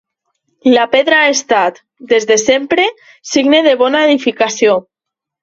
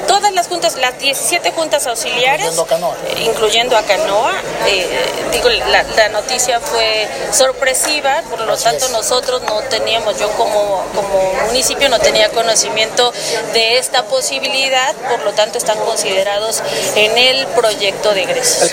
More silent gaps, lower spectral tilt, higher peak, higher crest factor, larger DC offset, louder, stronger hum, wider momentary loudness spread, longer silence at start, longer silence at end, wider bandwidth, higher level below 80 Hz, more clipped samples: neither; first, -2 dB/octave vs -0.5 dB/octave; about the same, 0 dBFS vs 0 dBFS; about the same, 12 dB vs 14 dB; neither; about the same, -12 LUFS vs -13 LUFS; neither; about the same, 7 LU vs 5 LU; first, 0.65 s vs 0 s; first, 0.6 s vs 0 s; second, 8 kHz vs 17 kHz; second, -58 dBFS vs -44 dBFS; neither